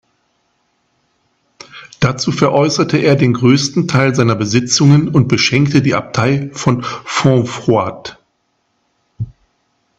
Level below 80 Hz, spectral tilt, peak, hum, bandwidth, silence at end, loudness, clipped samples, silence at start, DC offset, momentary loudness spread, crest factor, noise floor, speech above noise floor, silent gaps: -48 dBFS; -5.5 dB/octave; 0 dBFS; none; 8 kHz; 0.7 s; -13 LUFS; under 0.1%; 1.75 s; under 0.1%; 17 LU; 14 dB; -64 dBFS; 52 dB; none